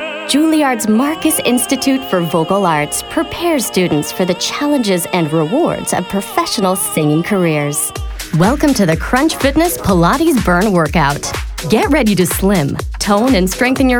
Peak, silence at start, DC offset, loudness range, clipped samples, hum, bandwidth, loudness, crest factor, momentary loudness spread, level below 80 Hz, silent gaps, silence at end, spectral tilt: 0 dBFS; 0 s; under 0.1%; 2 LU; under 0.1%; none; over 20 kHz; -14 LUFS; 12 dB; 5 LU; -30 dBFS; none; 0 s; -4.5 dB/octave